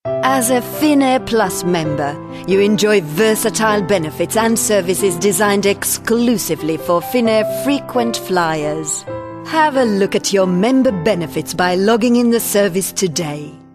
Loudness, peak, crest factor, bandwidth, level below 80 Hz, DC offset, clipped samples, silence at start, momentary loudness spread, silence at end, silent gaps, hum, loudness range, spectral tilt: -15 LUFS; 0 dBFS; 14 dB; 14 kHz; -50 dBFS; under 0.1%; under 0.1%; 0.05 s; 6 LU; 0.15 s; none; none; 2 LU; -4 dB/octave